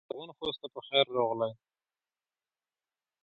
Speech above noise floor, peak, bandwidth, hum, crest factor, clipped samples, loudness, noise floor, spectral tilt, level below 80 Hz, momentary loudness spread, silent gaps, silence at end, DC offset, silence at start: over 58 dB; -10 dBFS; 4.8 kHz; none; 24 dB; under 0.1%; -31 LUFS; under -90 dBFS; -6.5 dB/octave; -76 dBFS; 13 LU; none; 1.7 s; under 0.1%; 0.15 s